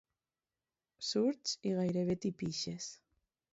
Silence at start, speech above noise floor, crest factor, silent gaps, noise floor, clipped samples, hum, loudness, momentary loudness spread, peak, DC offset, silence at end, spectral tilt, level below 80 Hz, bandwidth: 1 s; over 54 dB; 16 dB; none; under -90 dBFS; under 0.1%; none; -37 LUFS; 9 LU; -22 dBFS; under 0.1%; 0.55 s; -6 dB/octave; -72 dBFS; 8 kHz